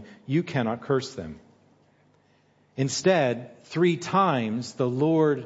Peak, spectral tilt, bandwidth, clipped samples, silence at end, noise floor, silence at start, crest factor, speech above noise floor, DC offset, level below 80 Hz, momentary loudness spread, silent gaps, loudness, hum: -8 dBFS; -6 dB/octave; 8 kHz; under 0.1%; 0 s; -63 dBFS; 0 s; 18 dB; 38 dB; under 0.1%; -66 dBFS; 13 LU; none; -25 LUFS; none